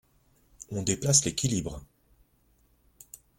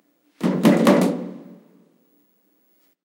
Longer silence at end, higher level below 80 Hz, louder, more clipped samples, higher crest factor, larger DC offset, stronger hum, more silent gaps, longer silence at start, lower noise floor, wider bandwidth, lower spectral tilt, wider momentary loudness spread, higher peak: about the same, 1.55 s vs 1.65 s; first, -54 dBFS vs -68 dBFS; second, -27 LUFS vs -19 LUFS; neither; about the same, 24 dB vs 20 dB; neither; neither; neither; first, 0.6 s vs 0.4 s; about the same, -66 dBFS vs -63 dBFS; about the same, 17 kHz vs 16.5 kHz; second, -3.5 dB/octave vs -6.5 dB/octave; first, 26 LU vs 19 LU; second, -8 dBFS vs -2 dBFS